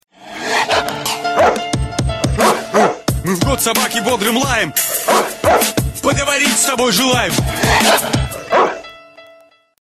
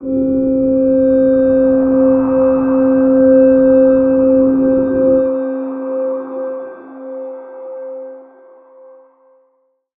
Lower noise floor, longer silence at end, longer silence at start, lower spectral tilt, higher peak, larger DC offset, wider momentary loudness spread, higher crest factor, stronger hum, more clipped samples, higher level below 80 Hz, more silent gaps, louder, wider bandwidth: second, -47 dBFS vs -61 dBFS; second, 0.6 s vs 1.75 s; first, 0.2 s vs 0 s; second, -3 dB/octave vs -13 dB/octave; about the same, 0 dBFS vs -2 dBFS; neither; second, 7 LU vs 19 LU; about the same, 16 dB vs 12 dB; neither; neither; first, -30 dBFS vs -44 dBFS; neither; about the same, -14 LUFS vs -12 LUFS; first, 13.5 kHz vs 2.8 kHz